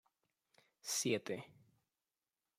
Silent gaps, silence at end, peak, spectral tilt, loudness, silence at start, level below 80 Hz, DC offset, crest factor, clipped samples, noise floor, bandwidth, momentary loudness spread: none; 1.15 s; -24 dBFS; -3 dB/octave; -40 LUFS; 0.85 s; -88 dBFS; under 0.1%; 22 dB; under 0.1%; under -90 dBFS; 16 kHz; 15 LU